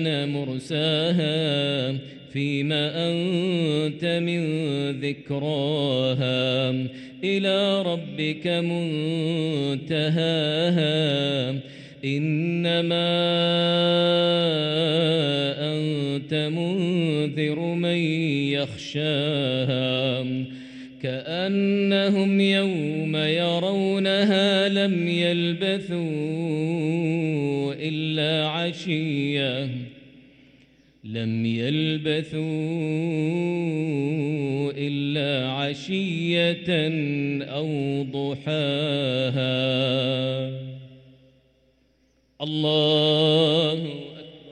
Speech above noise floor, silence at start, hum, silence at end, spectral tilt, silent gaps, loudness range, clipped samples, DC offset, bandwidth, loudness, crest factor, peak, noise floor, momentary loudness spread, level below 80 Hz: 41 dB; 0 s; none; 0 s; -6.5 dB/octave; none; 5 LU; under 0.1%; under 0.1%; 9.4 kHz; -24 LUFS; 16 dB; -8 dBFS; -64 dBFS; 8 LU; -66 dBFS